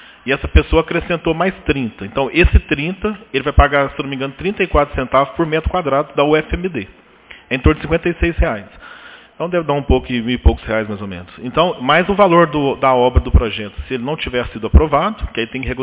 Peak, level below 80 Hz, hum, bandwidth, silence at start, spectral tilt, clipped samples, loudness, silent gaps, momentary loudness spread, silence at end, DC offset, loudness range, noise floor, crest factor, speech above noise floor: 0 dBFS; -22 dBFS; none; 4 kHz; 0.25 s; -10.5 dB/octave; under 0.1%; -16 LUFS; none; 11 LU; 0 s; under 0.1%; 4 LU; -42 dBFS; 16 dB; 26 dB